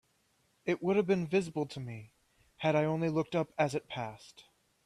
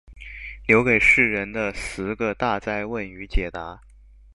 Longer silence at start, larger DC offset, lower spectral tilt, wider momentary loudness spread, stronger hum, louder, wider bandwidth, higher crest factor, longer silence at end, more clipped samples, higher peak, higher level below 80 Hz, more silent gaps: first, 0.65 s vs 0.1 s; second, under 0.1% vs 0.1%; about the same, -6.5 dB/octave vs -5.5 dB/octave; second, 13 LU vs 21 LU; neither; second, -33 LUFS vs -21 LUFS; about the same, 12.5 kHz vs 11.5 kHz; about the same, 20 dB vs 20 dB; about the same, 0.45 s vs 0.55 s; neither; second, -14 dBFS vs -2 dBFS; second, -70 dBFS vs -36 dBFS; neither